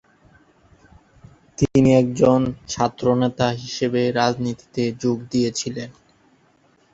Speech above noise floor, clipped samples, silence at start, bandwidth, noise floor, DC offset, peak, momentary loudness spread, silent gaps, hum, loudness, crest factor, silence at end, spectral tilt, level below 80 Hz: 39 dB; under 0.1%; 1.6 s; 8 kHz; -58 dBFS; under 0.1%; -2 dBFS; 11 LU; none; none; -20 LUFS; 20 dB; 1 s; -6 dB/octave; -48 dBFS